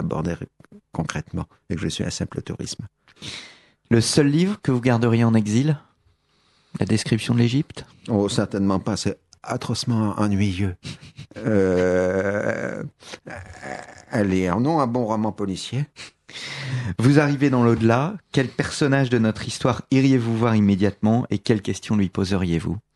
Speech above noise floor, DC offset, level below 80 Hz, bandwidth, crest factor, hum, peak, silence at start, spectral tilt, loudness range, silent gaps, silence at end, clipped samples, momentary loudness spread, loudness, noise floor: 41 dB; under 0.1%; -50 dBFS; 12 kHz; 20 dB; none; -2 dBFS; 0 s; -6 dB/octave; 4 LU; none; 0.15 s; under 0.1%; 17 LU; -22 LUFS; -63 dBFS